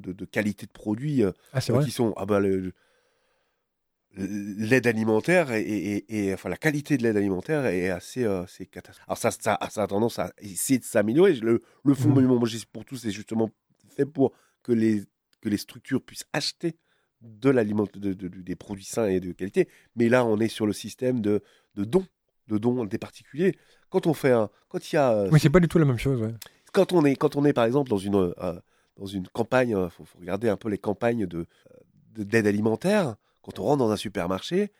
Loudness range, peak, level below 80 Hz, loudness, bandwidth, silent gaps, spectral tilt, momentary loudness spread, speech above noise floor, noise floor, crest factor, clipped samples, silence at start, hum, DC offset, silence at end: 5 LU; -4 dBFS; -56 dBFS; -25 LUFS; 16.5 kHz; none; -6.5 dB/octave; 14 LU; 54 dB; -79 dBFS; 20 dB; under 0.1%; 0.05 s; none; under 0.1%; 0.1 s